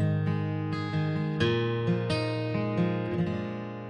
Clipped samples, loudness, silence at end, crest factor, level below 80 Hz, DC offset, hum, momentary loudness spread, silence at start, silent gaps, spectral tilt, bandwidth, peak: under 0.1%; -29 LUFS; 0 s; 16 dB; -62 dBFS; under 0.1%; none; 4 LU; 0 s; none; -7.5 dB/octave; 10 kHz; -14 dBFS